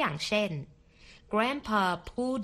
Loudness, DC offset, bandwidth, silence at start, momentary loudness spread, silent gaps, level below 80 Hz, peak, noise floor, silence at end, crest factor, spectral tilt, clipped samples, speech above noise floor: -30 LUFS; under 0.1%; 13.5 kHz; 0 s; 8 LU; none; -56 dBFS; -12 dBFS; -56 dBFS; 0 s; 18 dB; -5 dB/octave; under 0.1%; 26 dB